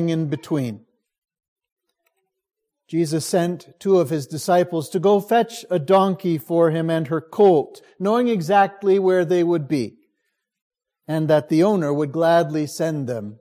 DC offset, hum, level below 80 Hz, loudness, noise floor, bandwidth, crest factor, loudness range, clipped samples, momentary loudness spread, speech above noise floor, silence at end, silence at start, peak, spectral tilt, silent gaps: under 0.1%; none; -68 dBFS; -20 LUFS; -76 dBFS; 16 kHz; 16 dB; 6 LU; under 0.1%; 9 LU; 56 dB; 0.05 s; 0 s; -4 dBFS; -6.5 dB/octave; 1.18-1.22 s, 1.48-1.56 s, 1.72-1.76 s, 10.61-10.70 s